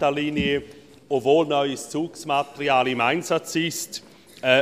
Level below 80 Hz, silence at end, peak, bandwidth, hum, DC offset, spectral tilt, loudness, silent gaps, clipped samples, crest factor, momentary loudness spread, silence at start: -54 dBFS; 0 s; -4 dBFS; 15 kHz; none; under 0.1%; -4 dB/octave; -23 LUFS; none; under 0.1%; 18 dB; 9 LU; 0 s